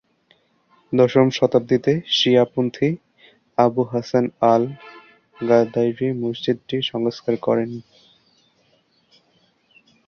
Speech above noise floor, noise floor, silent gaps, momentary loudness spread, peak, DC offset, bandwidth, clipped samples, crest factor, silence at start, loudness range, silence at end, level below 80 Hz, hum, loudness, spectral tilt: 43 dB; -62 dBFS; none; 9 LU; -2 dBFS; under 0.1%; 6.8 kHz; under 0.1%; 20 dB; 0.9 s; 7 LU; 2.25 s; -62 dBFS; none; -20 LUFS; -6.5 dB/octave